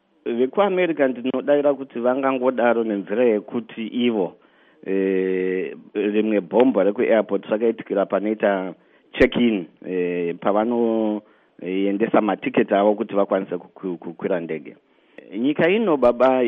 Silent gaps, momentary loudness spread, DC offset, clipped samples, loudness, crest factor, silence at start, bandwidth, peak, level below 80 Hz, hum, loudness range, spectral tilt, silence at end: none; 11 LU; under 0.1%; under 0.1%; -21 LUFS; 18 dB; 0.25 s; 5.4 kHz; -4 dBFS; -54 dBFS; none; 3 LU; -4.5 dB/octave; 0 s